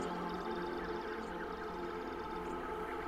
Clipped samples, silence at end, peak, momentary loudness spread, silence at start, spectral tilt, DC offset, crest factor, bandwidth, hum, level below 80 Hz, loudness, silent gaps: under 0.1%; 0 s; -28 dBFS; 2 LU; 0 s; -6 dB/octave; under 0.1%; 12 dB; 16 kHz; none; -56 dBFS; -41 LUFS; none